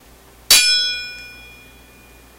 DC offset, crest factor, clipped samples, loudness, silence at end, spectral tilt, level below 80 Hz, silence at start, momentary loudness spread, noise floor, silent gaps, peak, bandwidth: under 0.1%; 20 dB; under 0.1%; -13 LUFS; 1.05 s; 2.5 dB/octave; -48 dBFS; 0.5 s; 24 LU; -46 dBFS; none; 0 dBFS; 16 kHz